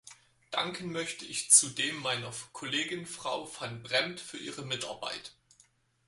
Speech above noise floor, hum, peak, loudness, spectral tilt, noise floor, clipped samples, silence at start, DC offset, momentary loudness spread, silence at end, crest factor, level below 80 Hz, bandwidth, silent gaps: 34 dB; none; -6 dBFS; -30 LUFS; -1 dB/octave; -67 dBFS; under 0.1%; 0.05 s; under 0.1%; 19 LU; 0.75 s; 26 dB; -72 dBFS; 12 kHz; none